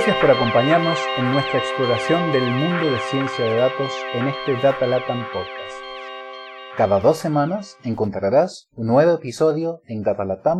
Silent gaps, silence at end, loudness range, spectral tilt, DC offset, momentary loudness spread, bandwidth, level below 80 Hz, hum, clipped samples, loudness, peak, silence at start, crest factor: none; 0 s; 4 LU; -6 dB/octave; under 0.1%; 14 LU; 13 kHz; -54 dBFS; none; under 0.1%; -20 LUFS; -2 dBFS; 0 s; 18 dB